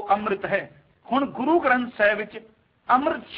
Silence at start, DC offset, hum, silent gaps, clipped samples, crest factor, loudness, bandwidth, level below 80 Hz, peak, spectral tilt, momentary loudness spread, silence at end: 0 s; under 0.1%; none; none; under 0.1%; 18 dB; -23 LUFS; 5.4 kHz; -60 dBFS; -6 dBFS; -8.5 dB/octave; 18 LU; 0 s